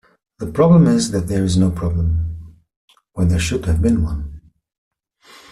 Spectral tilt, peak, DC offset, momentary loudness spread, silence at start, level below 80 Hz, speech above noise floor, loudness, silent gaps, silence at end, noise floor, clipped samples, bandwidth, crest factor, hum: -7 dB/octave; -4 dBFS; under 0.1%; 17 LU; 0.4 s; -32 dBFS; 33 dB; -17 LUFS; 2.76-2.88 s; 1.15 s; -48 dBFS; under 0.1%; 12.5 kHz; 16 dB; none